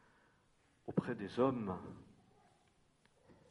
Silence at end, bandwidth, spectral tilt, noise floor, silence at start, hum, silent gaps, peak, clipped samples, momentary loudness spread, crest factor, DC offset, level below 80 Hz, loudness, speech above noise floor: 0.15 s; 11 kHz; -8.5 dB/octave; -73 dBFS; 0.85 s; none; none; -20 dBFS; under 0.1%; 19 LU; 24 dB; under 0.1%; -74 dBFS; -39 LUFS; 35 dB